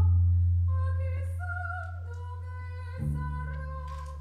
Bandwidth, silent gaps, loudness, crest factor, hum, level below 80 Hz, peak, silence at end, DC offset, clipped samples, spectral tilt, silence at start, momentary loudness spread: 2.9 kHz; none; -32 LUFS; 12 dB; none; -38 dBFS; -16 dBFS; 0 s; under 0.1%; under 0.1%; -9 dB/octave; 0 s; 14 LU